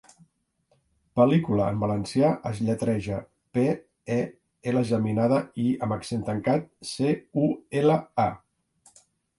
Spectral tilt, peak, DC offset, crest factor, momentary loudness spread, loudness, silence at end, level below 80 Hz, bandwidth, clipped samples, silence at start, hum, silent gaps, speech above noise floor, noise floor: -7.5 dB/octave; -6 dBFS; under 0.1%; 20 dB; 9 LU; -26 LUFS; 1 s; -56 dBFS; 11.5 kHz; under 0.1%; 1.15 s; none; none; 45 dB; -70 dBFS